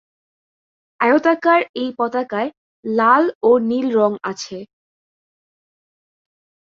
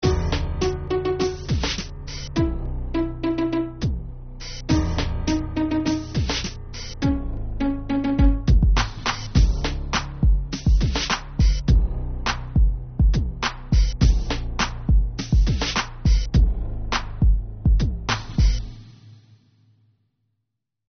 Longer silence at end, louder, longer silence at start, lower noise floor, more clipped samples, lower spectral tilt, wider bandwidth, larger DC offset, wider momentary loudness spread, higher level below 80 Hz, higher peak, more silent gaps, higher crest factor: first, 2.05 s vs 1.75 s; first, -17 LUFS vs -23 LUFS; first, 1 s vs 0 s; first, under -90 dBFS vs -80 dBFS; neither; about the same, -5 dB/octave vs -5.5 dB/octave; first, 7.8 kHz vs 6.6 kHz; neither; first, 13 LU vs 8 LU; second, -68 dBFS vs -24 dBFS; about the same, -2 dBFS vs -4 dBFS; first, 1.69-1.74 s, 2.57-2.83 s, 3.35-3.41 s vs none; about the same, 18 dB vs 16 dB